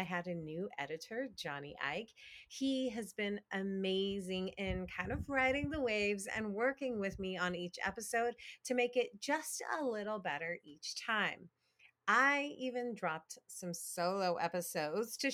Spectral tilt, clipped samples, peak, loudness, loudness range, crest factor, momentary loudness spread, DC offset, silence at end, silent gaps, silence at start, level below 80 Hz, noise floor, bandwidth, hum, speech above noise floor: -4 dB/octave; under 0.1%; -16 dBFS; -38 LUFS; 3 LU; 22 dB; 10 LU; under 0.1%; 0 s; none; 0 s; -62 dBFS; -70 dBFS; 18.5 kHz; none; 32 dB